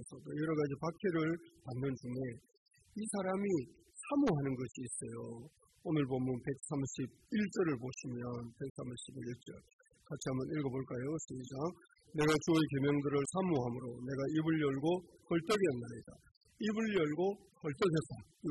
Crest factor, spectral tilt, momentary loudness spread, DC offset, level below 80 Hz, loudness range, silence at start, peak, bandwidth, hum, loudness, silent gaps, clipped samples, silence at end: 16 dB; -6 dB/octave; 13 LU; under 0.1%; -68 dBFS; 7 LU; 0 s; -20 dBFS; 12 kHz; none; -37 LUFS; 2.57-2.66 s, 8.70-8.75 s, 9.73-9.79 s, 16.31-16.41 s; under 0.1%; 0 s